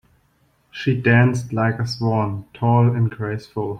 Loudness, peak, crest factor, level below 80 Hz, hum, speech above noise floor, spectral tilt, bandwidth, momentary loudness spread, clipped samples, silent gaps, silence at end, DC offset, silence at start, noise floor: -20 LUFS; -4 dBFS; 16 dB; -54 dBFS; none; 43 dB; -7.5 dB/octave; 9 kHz; 11 LU; under 0.1%; none; 0 s; under 0.1%; 0.75 s; -61 dBFS